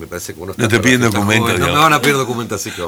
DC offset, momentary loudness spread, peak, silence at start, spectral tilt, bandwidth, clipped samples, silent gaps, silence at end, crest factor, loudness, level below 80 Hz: under 0.1%; 13 LU; 0 dBFS; 0 s; -4 dB/octave; over 20 kHz; under 0.1%; none; 0 s; 14 dB; -13 LUFS; -44 dBFS